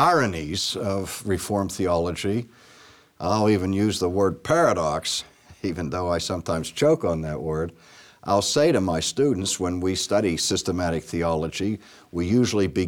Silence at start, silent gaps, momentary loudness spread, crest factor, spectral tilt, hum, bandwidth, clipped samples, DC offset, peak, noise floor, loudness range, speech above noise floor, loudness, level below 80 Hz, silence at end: 0 s; none; 9 LU; 16 dB; -4.5 dB/octave; none; 19 kHz; under 0.1%; under 0.1%; -8 dBFS; -52 dBFS; 3 LU; 28 dB; -24 LUFS; -48 dBFS; 0 s